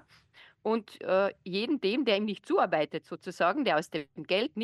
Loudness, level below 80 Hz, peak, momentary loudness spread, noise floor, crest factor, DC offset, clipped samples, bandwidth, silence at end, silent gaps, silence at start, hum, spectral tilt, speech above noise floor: -30 LUFS; -78 dBFS; -14 dBFS; 11 LU; -59 dBFS; 16 dB; under 0.1%; under 0.1%; 12.5 kHz; 0 s; none; 0.65 s; none; -5.5 dB/octave; 29 dB